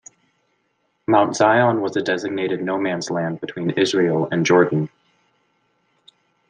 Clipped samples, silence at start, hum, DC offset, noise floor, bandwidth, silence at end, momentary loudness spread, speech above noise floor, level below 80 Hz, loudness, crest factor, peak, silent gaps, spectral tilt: under 0.1%; 1.1 s; none; under 0.1%; -68 dBFS; 10 kHz; 1.65 s; 9 LU; 50 dB; -66 dBFS; -19 LUFS; 20 dB; -2 dBFS; none; -5.5 dB/octave